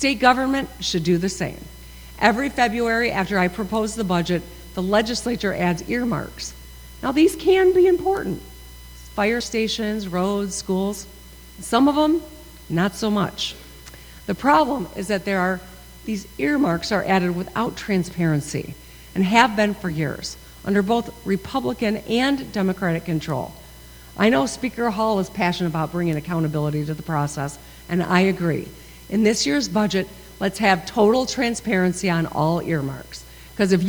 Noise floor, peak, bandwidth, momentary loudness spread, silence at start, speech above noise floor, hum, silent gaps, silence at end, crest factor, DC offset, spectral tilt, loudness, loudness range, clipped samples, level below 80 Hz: -43 dBFS; 0 dBFS; over 20 kHz; 16 LU; 0 s; 22 dB; none; none; 0 s; 22 dB; under 0.1%; -5 dB/octave; -21 LUFS; 3 LU; under 0.1%; -44 dBFS